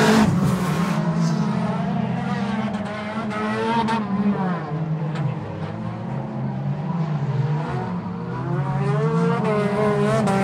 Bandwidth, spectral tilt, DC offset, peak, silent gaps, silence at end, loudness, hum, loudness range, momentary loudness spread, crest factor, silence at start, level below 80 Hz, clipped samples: 15 kHz; -7 dB/octave; under 0.1%; -4 dBFS; none; 0 s; -23 LUFS; none; 4 LU; 8 LU; 18 dB; 0 s; -52 dBFS; under 0.1%